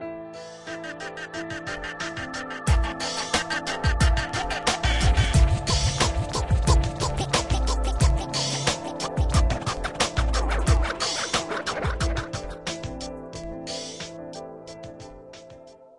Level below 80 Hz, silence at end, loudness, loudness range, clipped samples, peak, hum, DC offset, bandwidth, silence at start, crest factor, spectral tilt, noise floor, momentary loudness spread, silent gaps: -28 dBFS; 0.1 s; -26 LUFS; 8 LU; under 0.1%; -6 dBFS; none; under 0.1%; 11.5 kHz; 0 s; 20 dB; -4 dB/octave; -47 dBFS; 15 LU; none